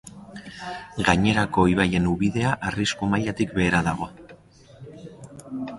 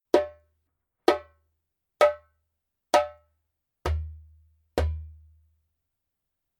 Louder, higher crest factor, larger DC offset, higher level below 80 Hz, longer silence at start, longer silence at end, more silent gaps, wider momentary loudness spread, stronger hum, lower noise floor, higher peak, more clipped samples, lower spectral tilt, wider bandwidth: first, -23 LUFS vs -27 LUFS; second, 20 dB vs 26 dB; neither; about the same, -44 dBFS vs -42 dBFS; about the same, 0.05 s vs 0.15 s; second, 0 s vs 1.5 s; neither; first, 22 LU vs 16 LU; neither; second, -49 dBFS vs -83 dBFS; about the same, -4 dBFS vs -4 dBFS; neither; about the same, -5.5 dB/octave vs -5.5 dB/octave; second, 11.5 kHz vs 16.5 kHz